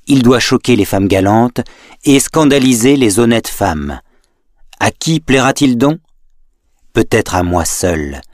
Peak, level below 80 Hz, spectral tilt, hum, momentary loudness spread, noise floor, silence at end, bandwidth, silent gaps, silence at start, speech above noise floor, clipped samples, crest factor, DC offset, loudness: 0 dBFS; -34 dBFS; -4.5 dB/octave; none; 9 LU; -53 dBFS; 0.1 s; 15.5 kHz; none; 0.05 s; 42 dB; under 0.1%; 12 dB; under 0.1%; -12 LUFS